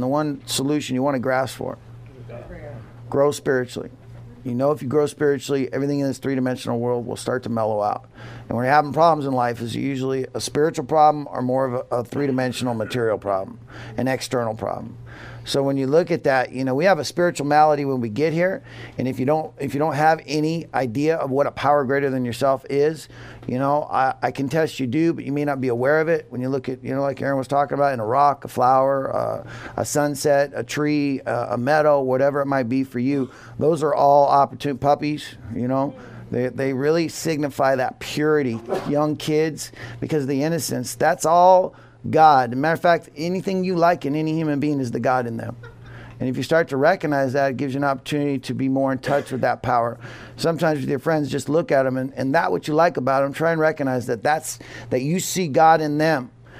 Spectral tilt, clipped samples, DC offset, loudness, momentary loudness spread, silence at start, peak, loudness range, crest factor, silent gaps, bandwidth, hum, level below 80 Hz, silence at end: -5.5 dB/octave; under 0.1%; under 0.1%; -21 LUFS; 12 LU; 0 s; -2 dBFS; 4 LU; 20 dB; none; 15.5 kHz; none; -56 dBFS; 0 s